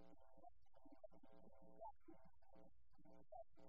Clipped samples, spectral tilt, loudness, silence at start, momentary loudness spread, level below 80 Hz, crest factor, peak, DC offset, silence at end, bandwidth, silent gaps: under 0.1%; -7 dB/octave; -64 LUFS; 0 s; 6 LU; -80 dBFS; 18 dB; -48 dBFS; 0.1%; 0 s; 5 kHz; none